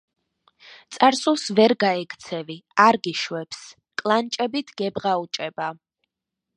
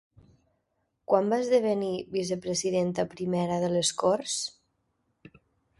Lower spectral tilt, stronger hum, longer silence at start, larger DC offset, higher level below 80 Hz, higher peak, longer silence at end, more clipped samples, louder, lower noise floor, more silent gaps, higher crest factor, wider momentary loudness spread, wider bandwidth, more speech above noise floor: about the same, -4 dB/octave vs -4.5 dB/octave; neither; second, 0.7 s vs 1.1 s; neither; about the same, -70 dBFS vs -66 dBFS; first, -2 dBFS vs -8 dBFS; second, 0.85 s vs 1.3 s; neither; first, -22 LUFS vs -28 LUFS; first, -84 dBFS vs -77 dBFS; neither; about the same, 22 dB vs 20 dB; first, 15 LU vs 7 LU; about the same, 11 kHz vs 11.5 kHz; first, 62 dB vs 50 dB